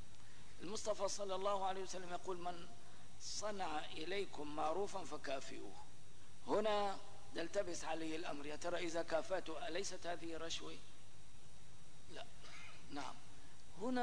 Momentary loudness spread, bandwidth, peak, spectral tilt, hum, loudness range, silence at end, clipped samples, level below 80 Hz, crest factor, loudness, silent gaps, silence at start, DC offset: 21 LU; 10.5 kHz; -26 dBFS; -3.5 dB/octave; none; 8 LU; 0 s; under 0.1%; -68 dBFS; 18 dB; -44 LUFS; none; 0 s; 0.8%